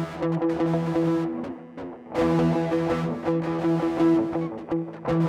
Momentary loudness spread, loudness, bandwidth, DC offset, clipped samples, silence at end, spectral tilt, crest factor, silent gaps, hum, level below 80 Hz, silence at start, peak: 10 LU; -25 LUFS; 8.8 kHz; under 0.1%; under 0.1%; 0 s; -8.5 dB/octave; 12 dB; none; none; -52 dBFS; 0 s; -12 dBFS